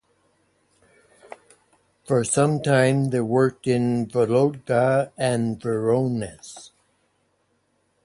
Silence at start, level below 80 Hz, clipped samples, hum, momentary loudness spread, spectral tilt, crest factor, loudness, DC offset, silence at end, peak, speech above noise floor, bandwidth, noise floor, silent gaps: 2.1 s; -60 dBFS; under 0.1%; none; 8 LU; -6 dB/octave; 18 dB; -22 LUFS; under 0.1%; 1.35 s; -6 dBFS; 47 dB; 11.5 kHz; -68 dBFS; none